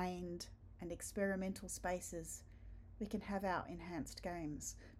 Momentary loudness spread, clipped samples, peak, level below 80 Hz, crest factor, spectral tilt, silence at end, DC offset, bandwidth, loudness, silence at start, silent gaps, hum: 12 LU; under 0.1%; -26 dBFS; -60 dBFS; 18 dB; -4.5 dB/octave; 0 s; under 0.1%; 15.5 kHz; -45 LUFS; 0 s; none; none